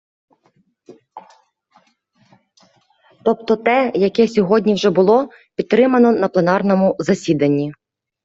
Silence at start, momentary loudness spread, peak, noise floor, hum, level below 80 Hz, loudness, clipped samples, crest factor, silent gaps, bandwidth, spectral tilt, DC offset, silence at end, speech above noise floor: 0.9 s; 7 LU; -2 dBFS; -61 dBFS; none; -60 dBFS; -16 LUFS; under 0.1%; 16 dB; none; 7.8 kHz; -6.5 dB/octave; under 0.1%; 0.55 s; 46 dB